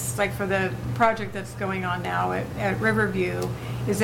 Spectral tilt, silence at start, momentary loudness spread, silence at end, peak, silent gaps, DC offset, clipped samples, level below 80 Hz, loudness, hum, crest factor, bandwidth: -5.5 dB/octave; 0 s; 8 LU; 0 s; -6 dBFS; none; under 0.1%; under 0.1%; -46 dBFS; -26 LUFS; none; 20 dB; 17 kHz